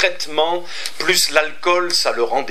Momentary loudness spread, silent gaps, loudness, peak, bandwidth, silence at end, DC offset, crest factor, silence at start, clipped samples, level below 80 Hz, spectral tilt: 7 LU; none; -17 LUFS; 0 dBFS; 16 kHz; 0 s; 5%; 18 dB; 0 s; under 0.1%; -68 dBFS; -1 dB/octave